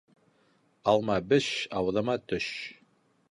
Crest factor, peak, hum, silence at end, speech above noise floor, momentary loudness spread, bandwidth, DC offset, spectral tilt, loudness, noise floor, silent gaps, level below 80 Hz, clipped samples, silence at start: 20 dB; -10 dBFS; none; 0.6 s; 39 dB; 9 LU; 11 kHz; under 0.1%; -5 dB/octave; -29 LUFS; -67 dBFS; none; -60 dBFS; under 0.1%; 0.85 s